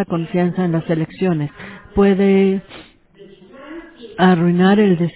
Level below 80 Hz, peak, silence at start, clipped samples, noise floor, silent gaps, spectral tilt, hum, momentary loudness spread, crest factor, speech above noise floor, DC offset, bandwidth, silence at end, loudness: -46 dBFS; -2 dBFS; 0 s; under 0.1%; -44 dBFS; none; -12 dB/octave; none; 22 LU; 14 dB; 29 dB; under 0.1%; 4 kHz; 0.05 s; -16 LUFS